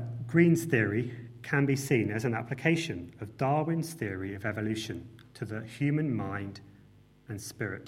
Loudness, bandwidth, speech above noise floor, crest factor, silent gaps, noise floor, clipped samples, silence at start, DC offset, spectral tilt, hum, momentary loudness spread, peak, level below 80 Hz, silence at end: -30 LUFS; 16 kHz; 28 dB; 20 dB; none; -58 dBFS; under 0.1%; 0 s; under 0.1%; -6.5 dB/octave; none; 17 LU; -10 dBFS; -66 dBFS; 0 s